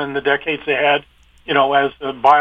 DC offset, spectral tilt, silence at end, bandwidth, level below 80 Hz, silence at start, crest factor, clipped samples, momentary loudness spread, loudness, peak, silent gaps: under 0.1%; -5.5 dB/octave; 0 s; 6.8 kHz; -54 dBFS; 0 s; 16 dB; under 0.1%; 6 LU; -17 LUFS; 0 dBFS; none